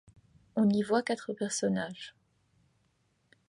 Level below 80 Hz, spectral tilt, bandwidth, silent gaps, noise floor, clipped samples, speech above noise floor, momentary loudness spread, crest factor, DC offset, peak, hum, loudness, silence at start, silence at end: -72 dBFS; -5 dB/octave; 11.5 kHz; none; -73 dBFS; under 0.1%; 43 dB; 14 LU; 18 dB; under 0.1%; -16 dBFS; none; -31 LUFS; 0.55 s; 1.4 s